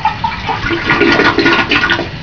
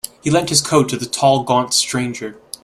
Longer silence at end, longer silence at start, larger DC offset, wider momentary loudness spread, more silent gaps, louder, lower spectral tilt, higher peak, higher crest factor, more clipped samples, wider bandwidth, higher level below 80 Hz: second, 0 s vs 0.3 s; second, 0 s vs 0.25 s; first, 0.9% vs under 0.1%; about the same, 8 LU vs 10 LU; neither; first, -11 LUFS vs -16 LUFS; first, -5 dB/octave vs -3.5 dB/octave; about the same, 0 dBFS vs 0 dBFS; second, 12 dB vs 18 dB; first, 0.2% vs under 0.1%; second, 5.4 kHz vs 15.5 kHz; first, -32 dBFS vs -54 dBFS